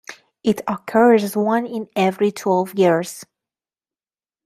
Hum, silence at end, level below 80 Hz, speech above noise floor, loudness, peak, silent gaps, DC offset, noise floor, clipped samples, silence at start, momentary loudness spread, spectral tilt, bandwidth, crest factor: none; 1.2 s; -66 dBFS; over 72 dB; -19 LUFS; -2 dBFS; none; under 0.1%; under -90 dBFS; under 0.1%; 0.1 s; 11 LU; -6 dB/octave; 15.5 kHz; 18 dB